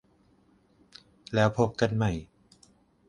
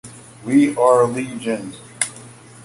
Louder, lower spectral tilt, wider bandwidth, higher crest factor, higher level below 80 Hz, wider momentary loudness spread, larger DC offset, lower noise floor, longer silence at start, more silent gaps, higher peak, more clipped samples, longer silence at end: second, -28 LUFS vs -18 LUFS; first, -6.5 dB/octave vs -5 dB/octave; about the same, 10.5 kHz vs 11.5 kHz; about the same, 22 dB vs 18 dB; first, -52 dBFS vs -60 dBFS; second, 12 LU vs 20 LU; neither; first, -64 dBFS vs -41 dBFS; first, 1.3 s vs 0.05 s; neither; second, -8 dBFS vs -2 dBFS; neither; first, 0.85 s vs 0.3 s